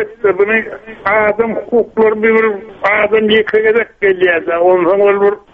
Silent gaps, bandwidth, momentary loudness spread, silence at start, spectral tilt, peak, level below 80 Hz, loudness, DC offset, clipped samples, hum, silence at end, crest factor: none; 4.3 kHz; 5 LU; 0 s; -7 dB/octave; 0 dBFS; -48 dBFS; -12 LUFS; under 0.1%; under 0.1%; none; 0.15 s; 12 dB